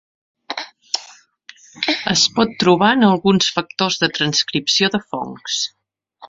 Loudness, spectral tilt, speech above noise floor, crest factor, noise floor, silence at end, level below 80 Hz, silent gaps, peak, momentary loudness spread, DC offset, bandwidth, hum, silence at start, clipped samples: -17 LUFS; -3.5 dB/octave; 29 dB; 18 dB; -46 dBFS; 0 s; -56 dBFS; none; 0 dBFS; 13 LU; under 0.1%; 7.8 kHz; none; 0.5 s; under 0.1%